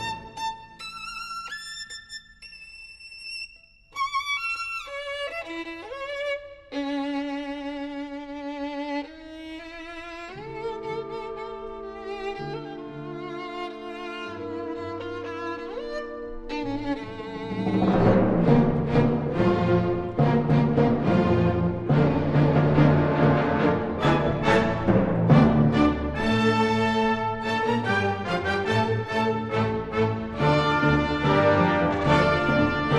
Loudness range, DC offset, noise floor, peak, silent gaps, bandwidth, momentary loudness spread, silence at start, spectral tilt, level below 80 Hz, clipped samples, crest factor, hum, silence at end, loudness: 13 LU; under 0.1%; -52 dBFS; -6 dBFS; none; 11.5 kHz; 17 LU; 0 s; -7.5 dB/octave; -42 dBFS; under 0.1%; 18 dB; none; 0 s; -24 LUFS